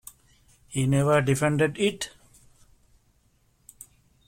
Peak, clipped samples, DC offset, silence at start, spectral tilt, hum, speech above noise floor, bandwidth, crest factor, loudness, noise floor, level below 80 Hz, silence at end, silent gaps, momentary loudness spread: -10 dBFS; under 0.1%; under 0.1%; 0.7 s; -5.5 dB/octave; none; 42 dB; 16.5 kHz; 18 dB; -25 LUFS; -65 dBFS; -58 dBFS; 2.2 s; none; 26 LU